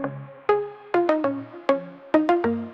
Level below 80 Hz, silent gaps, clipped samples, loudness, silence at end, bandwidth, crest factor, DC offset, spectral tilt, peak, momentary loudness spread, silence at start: -68 dBFS; none; under 0.1%; -24 LUFS; 0 s; 7 kHz; 18 dB; under 0.1%; -7.5 dB/octave; -6 dBFS; 8 LU; 0 s